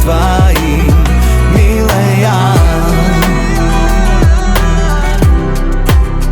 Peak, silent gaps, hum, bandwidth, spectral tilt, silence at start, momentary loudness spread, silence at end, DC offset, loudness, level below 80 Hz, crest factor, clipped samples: 0 dBFS; none; none; 19.5 kHz; -6 dB/octave; 0 s; 3 LU; 0 s; under 0.1%; -10 LUFS; -10 dBFS; 8 dB; under 0.1%